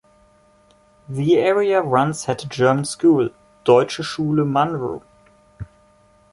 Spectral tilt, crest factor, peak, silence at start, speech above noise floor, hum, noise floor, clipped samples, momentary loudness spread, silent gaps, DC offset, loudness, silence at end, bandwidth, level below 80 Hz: -6 dB/octave; 18 dB; -2 dBFS; 1.1 s; 37 dB; none; -55 dBFS; under 0.1%; 17 LU; none; under 0.1%; -19 LUFS; 0.7 s; 11.5 kHz; -54 dBFS